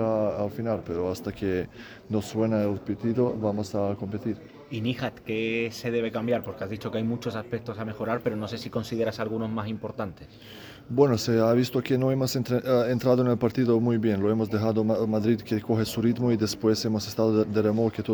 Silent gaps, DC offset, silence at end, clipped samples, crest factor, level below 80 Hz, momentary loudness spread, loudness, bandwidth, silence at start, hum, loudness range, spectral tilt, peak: none; under 0.1%; 0 s; under 0.1%; 18 dB; -58 dBFS; 10 LU; -27 LUFS; over 20 kHz; 0 s; none; 6 LU; -6.5 dB/octave; -8 dBFS